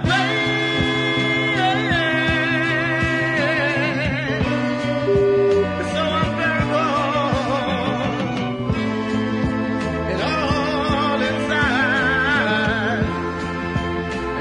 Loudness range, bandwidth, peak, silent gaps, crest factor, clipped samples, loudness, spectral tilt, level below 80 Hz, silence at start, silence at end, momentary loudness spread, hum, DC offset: 3 LU; 10.5 kHz; -6 dBFS; none; 14 dB; under 0.1%; -20 LUFS; -6 dB/octave; -40 dBFS; 0 s; 0 s; 6 LU; none; under 0.1%